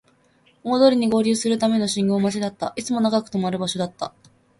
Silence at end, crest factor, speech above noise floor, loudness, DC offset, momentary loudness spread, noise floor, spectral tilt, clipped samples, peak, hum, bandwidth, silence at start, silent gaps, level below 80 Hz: 0.5 s; 18 dB; 39 dB; -21 LUFS; under 0.1%; 11 LU; -59 dBFS; -5 dB/octave; under 0.1%; -4 dBFS; none; 11.5 kHz; 0.65 s; none; -62 dBFS